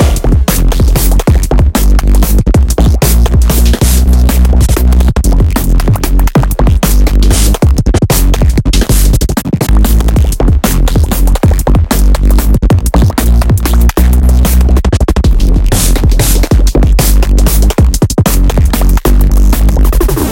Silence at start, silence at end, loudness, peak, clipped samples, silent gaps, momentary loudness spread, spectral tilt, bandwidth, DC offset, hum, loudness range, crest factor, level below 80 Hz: 0 s; 0 s; -9 LUFS; 0 dBFS; under 0.1%; none; 2 LU; -5.5 dB/octave; 17 kHz; 0.9%; none; 1 LU; 6 dB; -8 dBFS